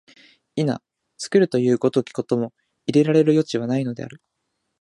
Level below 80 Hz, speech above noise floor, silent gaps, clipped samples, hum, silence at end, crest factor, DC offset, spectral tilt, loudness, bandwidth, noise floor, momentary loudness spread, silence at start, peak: -68 dBFS; 56 dB; none; under 0.1%; none; 0.65 s; 18 dB; under 0.1%; -7 dB/octave; -21 LUFS; 11.5 kHz; -76 dBFS; 15 LU; 0.55 s; -4 dBFS